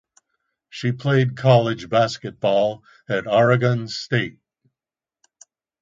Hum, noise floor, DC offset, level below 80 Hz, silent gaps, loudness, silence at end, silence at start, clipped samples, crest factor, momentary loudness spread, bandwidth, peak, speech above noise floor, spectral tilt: none; under -90 dBFS; under 0.1%; -60 dBFS; none; -20 LUFS; 1.5 s; 0.75 s; under 0.1%; 20 dB; 10 LU; 7.6 kHz; 0 dBFS; over 70 dB; -6.5 dB/octave